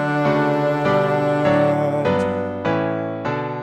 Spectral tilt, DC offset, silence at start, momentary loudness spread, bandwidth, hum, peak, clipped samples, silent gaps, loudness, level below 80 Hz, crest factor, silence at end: -7.5 dB/octave; under 0.1%; 0 s; 7 LU; 9.6 kHz; none; -4 dBFS; under 0.1%; none; -19 LUFS; -54 dBFS; 14 dB; 0 s